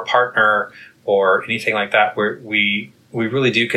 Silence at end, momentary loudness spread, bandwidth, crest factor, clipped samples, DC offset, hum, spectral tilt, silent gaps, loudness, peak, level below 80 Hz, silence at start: 0 s; 9 LU; 13.5 kHz; 16 dB; under 0.1%; under 0.1%; none; -5 dB/octave; none; -17 LUFS; -2 dBFS; -66 dBFS; 0 s